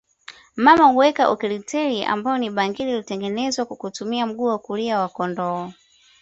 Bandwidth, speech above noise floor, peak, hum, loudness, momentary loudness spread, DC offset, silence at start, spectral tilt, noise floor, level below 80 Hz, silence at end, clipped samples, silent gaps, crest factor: 8 kHz; 25 dB; -2 dBFS; none; -21 LUFS; 12 LU; under 0.1%; 0.3 s; -4.5 dB/octave; -46 dBFS; -62 dBFS; 0.5 s; under 0.1%; none; 20 dB